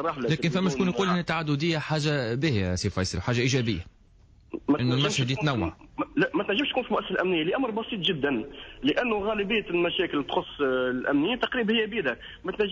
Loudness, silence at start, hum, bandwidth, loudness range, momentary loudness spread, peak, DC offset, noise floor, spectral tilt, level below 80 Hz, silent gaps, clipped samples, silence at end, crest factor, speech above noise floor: -27 LUFS; 0 s; none; 8 kHz; 1 LU; 6 LU; -14 dBFS; under 0.1%; -56 dBFS; -5.5 dB/octave; -48 dBFS; none; under 0.1%; 0 s; 14 dB; 29 dB